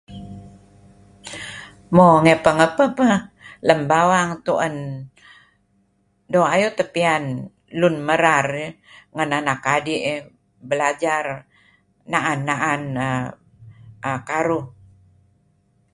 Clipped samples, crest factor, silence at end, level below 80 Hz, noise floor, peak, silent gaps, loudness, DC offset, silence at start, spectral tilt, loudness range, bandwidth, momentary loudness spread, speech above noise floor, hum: under 0.1%; 20 dB; 1.25 s; -56 dBFS; -64 dBFS; 0 dBFS; none; -19 LUFS; under 0.1%; 0.1 s; -5.5 dB/octave; 7 LU; 11.5 kHz; 19 LU; 45 dB; none